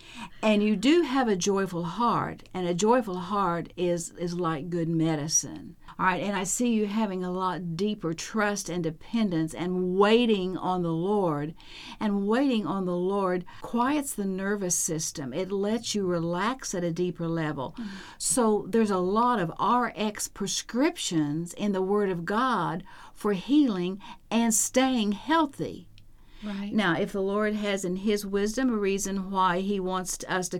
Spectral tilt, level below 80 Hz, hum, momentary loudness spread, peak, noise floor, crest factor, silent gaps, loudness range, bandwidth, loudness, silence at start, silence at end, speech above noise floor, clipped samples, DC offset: -4.5 dB/octave; -52 dBFS; none; 9 LU; -8 dBFS; -49 dBFS; 18 dB; none; 2 LU; 17 kHz; -27 LUFS; 0 s; 0 s; 22 dB; under 0.1%; under 0.1%